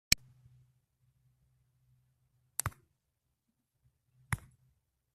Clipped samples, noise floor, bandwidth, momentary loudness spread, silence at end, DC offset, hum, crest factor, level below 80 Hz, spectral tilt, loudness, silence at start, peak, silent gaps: under 0.1%; -83 dBFS; 15 kHz; 10 LU; 0.8 s; under 0.1%; none; 38 dB; -58 dBFS; -1 dB/octave; -37 LUFS; 0.1 s; -4 dBFS; none